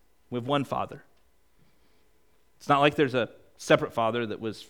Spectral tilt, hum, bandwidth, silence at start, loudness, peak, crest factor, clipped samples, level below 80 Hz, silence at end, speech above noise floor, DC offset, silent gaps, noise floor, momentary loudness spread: -5.5 dB/octave; none; 18.5 kHz; 0.3 s; -27 LUFS; -6 dBFS; 22 dB; under 0.1%; -64 dBFS; 0.05 s; 41 dB; 0.1%; none; -68 dBFS; 16 LU